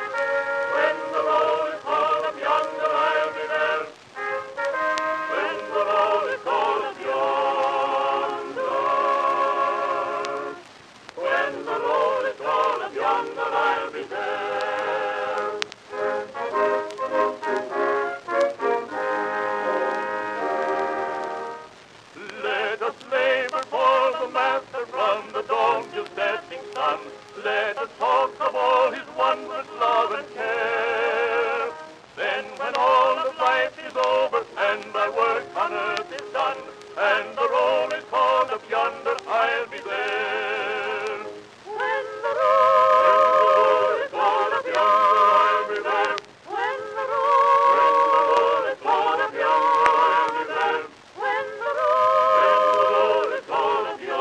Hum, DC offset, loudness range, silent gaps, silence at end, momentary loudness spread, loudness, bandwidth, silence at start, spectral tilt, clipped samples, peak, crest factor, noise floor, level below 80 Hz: none; under 0.1%; 6 LU; none; 0 s; 11 LU; -22 LUFS; 10 kHz; 0 s; -3 dB/octave; under 0.1%; 0 dBFS; 22 dB; -47 dBFS; -70 dBFS